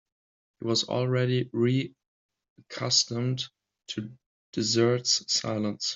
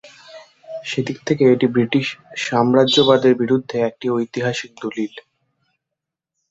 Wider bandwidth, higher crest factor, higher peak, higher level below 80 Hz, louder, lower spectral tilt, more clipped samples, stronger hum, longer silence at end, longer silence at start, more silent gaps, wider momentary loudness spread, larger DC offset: about the same, 7.8 kHz vs 8 kHz; about the same, 20 dB vs 18 dB; second, -8 dBFS vs -2 dBFS; second, -70 dBFS vs -62 dBFS; second, -27 LUFS vs -18 LUFS; second, -4 dB/octave vs -5.5 dB/octave; neither; neither; second, 0 s vs 1.3 s; first, 0.6 s vs 0.05 s; first, 2.07-2.29 s, 2.50-2.56 s, 4.26-4.53 s vs none; about the same, 14 LU vs 13 LU; neither